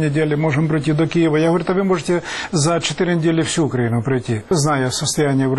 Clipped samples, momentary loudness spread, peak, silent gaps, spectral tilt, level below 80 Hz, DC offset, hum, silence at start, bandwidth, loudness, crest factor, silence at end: under 0.1%; 4 LU; -6 dBFS; none; -5.5 dB/octave; -48 dBFS; under 0.1%; none; 0 s; 12 kHz; -18 LUFS; 12 dB; 0 s